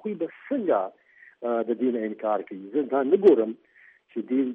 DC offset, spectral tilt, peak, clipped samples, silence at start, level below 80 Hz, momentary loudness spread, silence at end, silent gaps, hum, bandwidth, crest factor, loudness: under 0.1%; -6 dB/octave; -6 dBFS; under 0.1%; 0.05 s; -80 dBFS; 16 LU; 0 s; none; none; 4.2 kHz; 18 dB; -25 LUFS